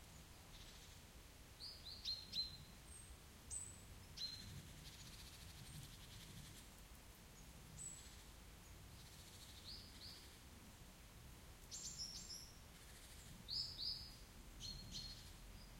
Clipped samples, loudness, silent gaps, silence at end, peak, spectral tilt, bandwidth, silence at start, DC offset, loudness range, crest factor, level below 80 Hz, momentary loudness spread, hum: under 0.1%; -53 LUFS; none; 0 s; -34 dBFS; -2 dB/octave; 16.5 kHz; 0 s; under 0.1%; 8 LU; 22 dB; -64 dBFS; 15 LU; none